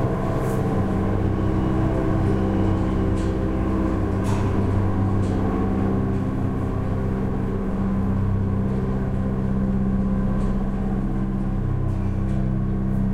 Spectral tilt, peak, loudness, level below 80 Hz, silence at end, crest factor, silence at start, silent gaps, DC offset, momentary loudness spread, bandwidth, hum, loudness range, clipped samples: -9 dB/octave; -8 dBFS; -23 LUFS; -28 dBFS; 0 s; 12 dB; 0 s; none; 0.4%; 3 LU; 11 kHz; none; 2 LU; under 0.1%